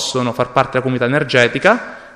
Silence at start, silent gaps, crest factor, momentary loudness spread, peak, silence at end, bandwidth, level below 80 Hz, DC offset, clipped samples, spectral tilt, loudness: 0 s; none; 16 dB; 6 LU; 0 dBFS; 0.05 s; 13.5 kHz; -50 dBFS; under 0.1%; under 0.1%; -4.5 dB/octave; -15 LUFS